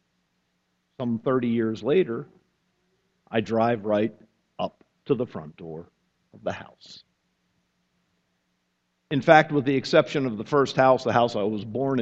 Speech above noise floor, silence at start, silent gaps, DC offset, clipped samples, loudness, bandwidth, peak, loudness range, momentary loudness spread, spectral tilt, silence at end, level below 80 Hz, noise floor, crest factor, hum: 51 dB; 1 s; none; under 0.1%; under 0.1%; -24 LUFS; 8 kHz; 0 dBFS; 17 LU; 16 LU; -6.5 dB/octave; 0 s; -64 dBFS; -74 dBFS; 26 dB; none